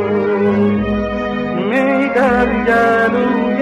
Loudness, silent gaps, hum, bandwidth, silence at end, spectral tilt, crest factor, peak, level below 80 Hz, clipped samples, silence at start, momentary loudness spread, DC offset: -15 LUFS; none; none; 10.5 kHz; 0 s; -7.5 dB/octave; 10 dB; -4 dBFS; -36 dBFS; under 0.1%; 0 s; 6 LU; under 0.1%